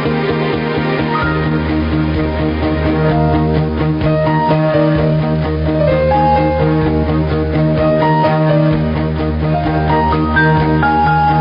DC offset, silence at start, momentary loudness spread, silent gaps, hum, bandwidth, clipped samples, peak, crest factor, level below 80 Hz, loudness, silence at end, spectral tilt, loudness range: under 0.1%; 0 s; 4 LU; none; none; 5.4 kHz; under 0.1%; -2 dBFS; 12 dB; -28 dBFS; -14 LUFS; 0 s; -10.5 dB/octave; 2 LU